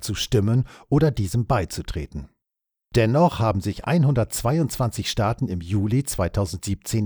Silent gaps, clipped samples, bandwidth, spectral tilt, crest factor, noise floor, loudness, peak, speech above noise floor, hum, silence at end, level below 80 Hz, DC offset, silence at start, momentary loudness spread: none; under 0.1%; over 20 kHz; -6 dB/octave; 16 dB; -85 dBFS; -23 LUFS; -6 dBFS; 63 dB; none; 0 s; -40 dBFS; under 0.1%; 0 s; 9 LU